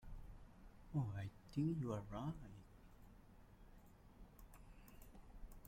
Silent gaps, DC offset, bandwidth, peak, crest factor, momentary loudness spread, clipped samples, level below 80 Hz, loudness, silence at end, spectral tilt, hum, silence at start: none; under 0.1%; 16.5 kHz; -30 dBFS; 20 dB; 23 LU; under 0.1%; -62 dBFS; -46 LUFS; 0 s; -8.5 dB/octave; none; 0 s